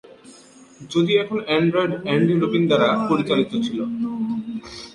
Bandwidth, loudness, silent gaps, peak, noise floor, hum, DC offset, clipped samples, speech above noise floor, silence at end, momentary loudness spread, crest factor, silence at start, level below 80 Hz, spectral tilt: 11 kHz; -21 LUFS; none; -6 dBFS; -47 dBFS; none; under 0.1%; under 0.1%; 27 dB; 0.05 s; 8 LU; 16 dB; 0.1 s; -58 dBFS; -6.5 dB/octave